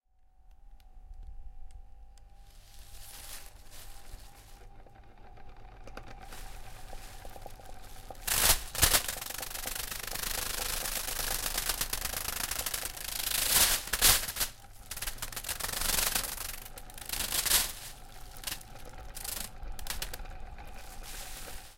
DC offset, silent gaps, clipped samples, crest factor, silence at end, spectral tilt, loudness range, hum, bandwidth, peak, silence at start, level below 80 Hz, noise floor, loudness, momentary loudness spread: under 0.1%; none; under 0.1%; 28 dB; 0 s; -0.5 dB/octave; 23 LU; none; 17 kHz; -6 dBFS; 0.45 s; -44 dBFS; -59 dBFS; -30 LUFS; 25 LU